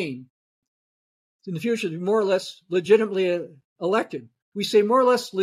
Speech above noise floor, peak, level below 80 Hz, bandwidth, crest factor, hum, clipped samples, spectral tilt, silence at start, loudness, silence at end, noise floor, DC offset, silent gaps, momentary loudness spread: over 68 dB; -6 dBFS; -78 dBFS; 14.5 kHz; 18 dB; none; under 0.1%; -5 dB/octave; 0 s; -23 LUFS; 0 s; under -90 dBFS; under 0.1%; 0.30-0.62 s, 0.68-1.39 s, 3.64-3.76 s, 4.42-4.52 s; 18 LU